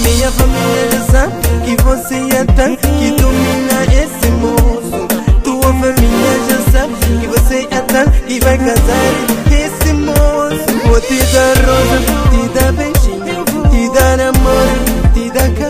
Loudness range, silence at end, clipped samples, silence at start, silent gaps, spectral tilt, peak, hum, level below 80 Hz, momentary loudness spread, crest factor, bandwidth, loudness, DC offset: 1 LU; 0 s; under 0.1%; 0 s; none; -5 dB/octave; 0 dBFS; none; -14 dBFS; 4 LU; 10 dB; 16 kHz; -11 LUFS; under 0.1%